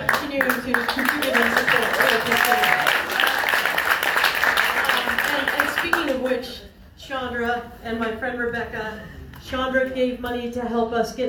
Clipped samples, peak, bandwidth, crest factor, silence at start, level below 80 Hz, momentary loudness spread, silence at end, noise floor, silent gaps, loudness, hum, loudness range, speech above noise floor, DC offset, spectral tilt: under 0.1%; -2 dBFS; over 20 kHz; 20 dB; 0 s; -48 dBFS; 12 LU; 0 s; -43 dBFS; none; -21 LUFS; none; 8 LU; 19 dB; under 0.1%; -2.5 dB/octave